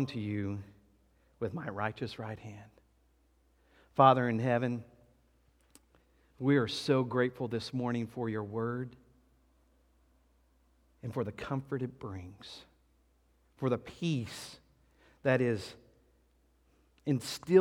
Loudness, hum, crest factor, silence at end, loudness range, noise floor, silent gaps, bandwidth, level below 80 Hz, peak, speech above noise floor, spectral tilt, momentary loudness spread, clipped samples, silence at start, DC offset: -33 LUFS; none; 26 dB; 0 s; 10 LU; -69 dBFS; none; 16 kHz; -68 dBFS; -8 dBFS; 37 dB; -6.5 dB/octave; 17 LU; under 0.1%; 0 s; under 0.1%